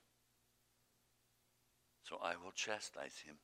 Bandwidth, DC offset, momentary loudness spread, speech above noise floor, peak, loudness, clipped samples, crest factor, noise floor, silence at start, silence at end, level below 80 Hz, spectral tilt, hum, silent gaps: 15.5 kHz; under 0.1%; 10 LU; 32 dB; -26 dBFS; -46 LUFS; under 0.1%; 26 dB; -79 dBFS; 2.05 s; 0.05 s; -86 dBFS; -1 dB/octave; 60 Hz at -85 dBFS; none